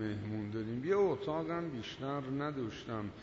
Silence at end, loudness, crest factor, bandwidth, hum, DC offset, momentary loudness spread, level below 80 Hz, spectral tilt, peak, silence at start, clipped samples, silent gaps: 0 s; -37 LUFS; 16 dB; 7.6 kHz; none; under 0.1%; 10 LU; -64 dBFS; -6 dB/octave; -22 dBFS; 0 s; under 0.1%; none